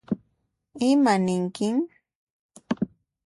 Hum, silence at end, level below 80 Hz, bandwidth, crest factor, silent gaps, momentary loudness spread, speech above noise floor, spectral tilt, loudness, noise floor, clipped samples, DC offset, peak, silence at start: none; 0.4 s; -64 dBFS; 11.5 kHz; 16 dB; 2.15-2.49 s; 13 LU; 52 dB; -6 dB/octave; -25 LUFS; -73 dBFS; under 0.1%; under 0.1%; -10 dBFS; 0.1 s